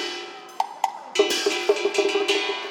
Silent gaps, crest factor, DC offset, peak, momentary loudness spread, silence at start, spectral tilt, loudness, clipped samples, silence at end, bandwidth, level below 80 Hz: none; 20 dB; under 0.1%; -4 dBFS; 9 LU; 0 s; -0.5 dB/octave; -23 LUFS; under 0.1%; 0 s; 19 kHz; -88 dBFS